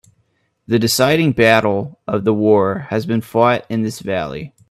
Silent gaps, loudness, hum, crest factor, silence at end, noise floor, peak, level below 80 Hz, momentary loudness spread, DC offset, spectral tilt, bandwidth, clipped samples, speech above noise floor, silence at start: none; -16 LUFS; none; 16 dB; 0.2 s; -64 dBFS; 0 dBFS; -52 dBFS; 10 LU; under 0.1%; -5 dB/octave; 16 kHz; under 0.1%; 48 dB; 0.7 s